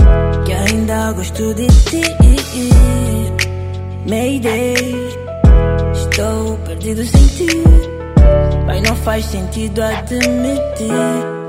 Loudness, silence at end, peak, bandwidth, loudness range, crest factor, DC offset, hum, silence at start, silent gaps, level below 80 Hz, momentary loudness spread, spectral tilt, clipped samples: -14 LUFS; 0 s; 0 dBFS; 15.5 kHz; 2 LU; 12 dB; under 0.1%; none; 0 s; none; -14 dBFS; 9 LU; -6 dB/octave; under 0.1%